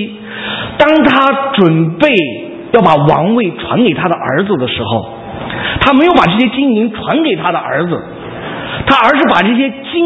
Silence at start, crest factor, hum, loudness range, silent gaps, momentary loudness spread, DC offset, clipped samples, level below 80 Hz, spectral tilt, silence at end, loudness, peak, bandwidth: 0 s; 12 dB; none; 2 LU; none; 13 LU; under 0.1%; 0.3%; -38 dBFS; -7.5 dB/octave; 0 s; -11 LUFS; 0 dBFS; 8 kHz